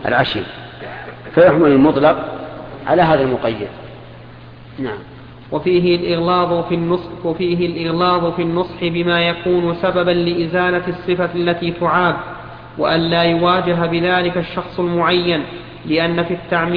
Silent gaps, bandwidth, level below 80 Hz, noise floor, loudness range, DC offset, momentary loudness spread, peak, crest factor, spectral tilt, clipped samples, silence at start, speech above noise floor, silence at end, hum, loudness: none; 5.2 kHz; -44 dBFS; -37 dBFS; 4 LU; under 0.1%; 17 LU; 0 dBFS; 16 dB; -9 dB/octave; under 0.1%; 0 s; 21 dB; 0 s; none; -16 LUFS